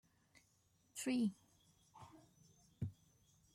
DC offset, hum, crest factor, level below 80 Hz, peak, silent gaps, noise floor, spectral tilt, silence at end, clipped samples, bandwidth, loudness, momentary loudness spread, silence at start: under 0.1%; none; 18 dB; -78 dBFS; -30 dBFS; none; -77 dBFS; -5 dB/octave; 0.6 s; under 0.1%; 15.5 kHz; -44 LUFS; 23 LU; 0.95 s